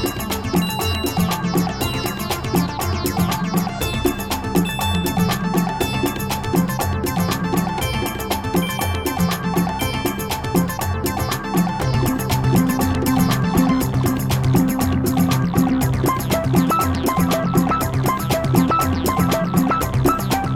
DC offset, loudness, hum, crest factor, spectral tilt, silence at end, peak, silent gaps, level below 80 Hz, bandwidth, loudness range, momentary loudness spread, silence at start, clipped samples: 0.1%; -20 LUFS; none; 16 dB; -5.5 dB/octave; 0 s; -2 dBFS; none; -34 dBFS; 17.5 kHz; 3 LU; 5 LU; 0 s; under 0.1%